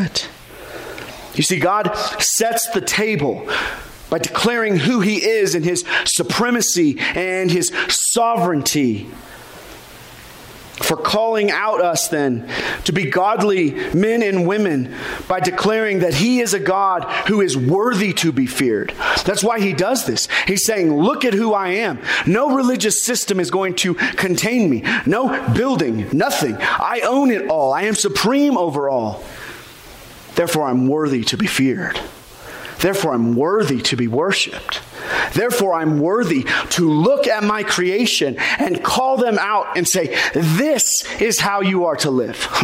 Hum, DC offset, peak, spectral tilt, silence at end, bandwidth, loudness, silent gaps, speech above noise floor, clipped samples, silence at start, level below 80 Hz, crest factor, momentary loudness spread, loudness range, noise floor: none; under 0.1%; -6 dBFS; -3.5 dB/octave; 0 s; 16 kHz; -17 LUFS; none; 21 dB; under 0.1%; 0 s; -48 dBFS; 12 dB; 10 LU; 3 LU; -39 dBFS